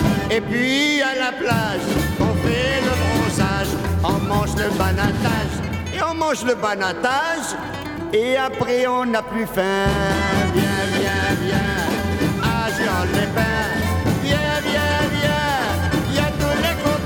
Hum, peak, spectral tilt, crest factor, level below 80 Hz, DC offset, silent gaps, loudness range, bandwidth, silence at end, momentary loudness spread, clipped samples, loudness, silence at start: none; -4 dBFS; -5 dB/octave; 14 dB; -34 dBFS; under 0.1%; none; 2 LU; over 20 kHz; 0 s; 3 LU; under 0.1%; -20 LUFS; 0 s